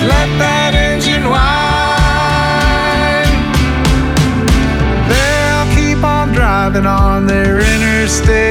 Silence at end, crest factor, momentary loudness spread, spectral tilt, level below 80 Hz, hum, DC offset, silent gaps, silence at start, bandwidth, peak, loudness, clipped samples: 0 s; 10 dB; 1 LU; -5 dB/octave; -16 dBFS; none; under 0.1%; none; 0 s; 16 kHz; 0 dBFS; -11 LUFS; under 0.1%